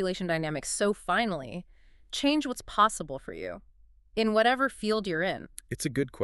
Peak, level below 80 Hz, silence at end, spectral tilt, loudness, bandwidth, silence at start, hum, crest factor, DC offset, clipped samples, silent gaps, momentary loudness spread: -8 dBFS; -54 dBFS; 0 s; -4 dB/octave; -29 LUFS; 12 kHz; 0 s; none; 22 dB; under 0.1%; under 0.1%; none; 14 LU